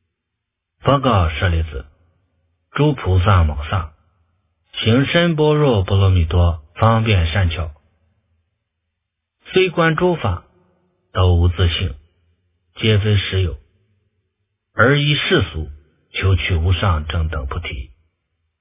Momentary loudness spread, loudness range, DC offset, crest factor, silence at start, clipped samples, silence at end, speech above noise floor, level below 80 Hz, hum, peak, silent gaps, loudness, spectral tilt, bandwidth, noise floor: 13 LU; 5 LU; under 0.1%; 18 dB; 0.85 s; under 0.1%; 0.75 s; 62 dB; -26 dBFS; none; 0 dBFS; none; -17 LUFS; -10.5 dB/octave; 3.8 kHz; -78 dBFS